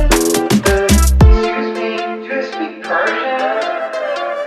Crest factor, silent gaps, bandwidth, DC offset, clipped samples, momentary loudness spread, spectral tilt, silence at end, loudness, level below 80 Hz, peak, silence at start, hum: 14 dB; none; 14 kHz; under 0.1%; under 0.1%; 10 LU; -5 dB/octave; 0 s; -15 LUFS; -18 dBFS; 0 dBFS; 0 s; none